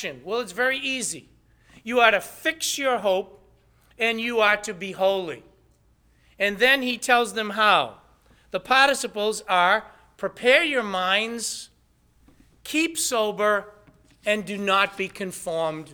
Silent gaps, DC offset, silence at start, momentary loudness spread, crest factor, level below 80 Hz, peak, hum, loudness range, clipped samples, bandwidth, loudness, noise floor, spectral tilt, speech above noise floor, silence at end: none; under 0.1%; 0 s; 14 LU; 22 dB; -62 dBFS; -2 dBFS; none; 4 LU; under 0.1%; over 20 kHz; -23 LUFS; -62 dBFS; -2 dB/octave; 38 dB; 0 s